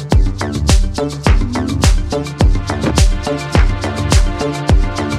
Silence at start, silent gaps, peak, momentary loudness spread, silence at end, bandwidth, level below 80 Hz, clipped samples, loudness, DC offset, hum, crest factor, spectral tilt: 0 s; none; 0 dBFS; 4 LU; 0 s; 13.5 kHz; -16 dBFS; under 0.1%; -16 LUFS; under 0.1%; none; 12 dB; -5.5 dB/octave